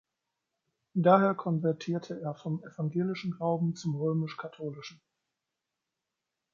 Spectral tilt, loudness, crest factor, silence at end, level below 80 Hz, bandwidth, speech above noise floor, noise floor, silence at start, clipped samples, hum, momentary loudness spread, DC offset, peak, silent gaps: -8 dB/octave; -31 LUFS; 24 dB; 1.6 s; -78 dBFS; 7.4 kHz; 57 dB; -87 dBFS; 0.95 s; under 0.1%; none; 16 LU; under 0.1%; -8 dBFS; none